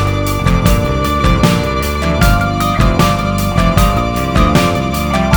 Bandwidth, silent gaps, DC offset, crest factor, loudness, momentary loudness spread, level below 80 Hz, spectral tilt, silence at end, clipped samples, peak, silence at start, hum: over 20 kHz; none; under 0.1%; 12 dB; -13 LUFS; 4 LU; -18 dBFS; -5.5 dB/octave; 0 s; under 0.1%; 0 dBFS; 0 s; none